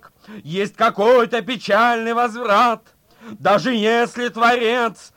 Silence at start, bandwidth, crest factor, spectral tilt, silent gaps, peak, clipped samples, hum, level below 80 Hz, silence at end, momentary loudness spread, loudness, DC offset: 0.3 s; 16.5 kHz; 14 dB; -4.5 dB/octave; none; -4 dBFS; under 0.1%; none; -62 dBFS; 0.25 s; 8 LU; -17 LUFS; under 0.1%